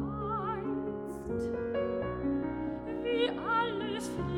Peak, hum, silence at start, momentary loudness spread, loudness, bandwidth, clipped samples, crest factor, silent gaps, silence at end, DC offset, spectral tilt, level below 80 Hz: -18 dBFS; none; 0 s; 6 LU; -34 LUFS; 15 kHz; under 0.1%; 16 dB; none; 0 s; under 0.1%; -6 dB/octave; -52 dBFS